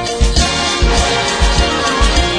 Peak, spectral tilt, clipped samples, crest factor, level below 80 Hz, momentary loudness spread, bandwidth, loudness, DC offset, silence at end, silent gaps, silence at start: 0 dBFS; -3.5 dB/octave; under 0.1%; 12 dB; -16 dBFS; 1 LU; 10 kHz; -13 LUFS; under 0.1%; 0 s; none; 0 s